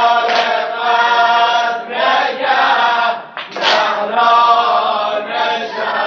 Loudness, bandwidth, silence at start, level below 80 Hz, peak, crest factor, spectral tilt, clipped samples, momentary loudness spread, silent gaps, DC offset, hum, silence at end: -13 LUFS; 7.2 kHz; 0 s; -68 dBFS; 0 dBFS; 14 dB; 2 dB/octave; under 0.1%; 7 LU; none; under 0.1%; none; 0 s